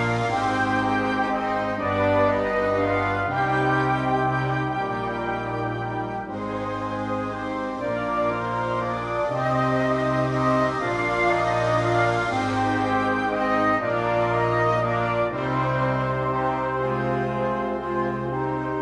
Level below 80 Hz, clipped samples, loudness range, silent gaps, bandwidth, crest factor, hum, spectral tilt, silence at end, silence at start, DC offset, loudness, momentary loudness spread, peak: -48 dBFS; under 0.1%; 5 LU; none; 11.5 kHz; 16 dB; none; -7 dB/octave; 0 s; 0 s; under 0.1%; -24 LUFS; 6 LU; -8 dBFS